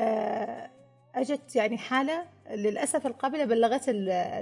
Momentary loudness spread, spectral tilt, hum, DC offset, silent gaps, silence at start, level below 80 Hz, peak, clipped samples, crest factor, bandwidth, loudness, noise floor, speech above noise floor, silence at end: 12 LU; -4 dB/octave; none; under 0.1%; none; 0 s; -80 dBFS; -12 dBFS; under 0.1%; 16 dB; 11.5 kHz; -29 LUFS; -53 dBFS; 25 dB; 0 s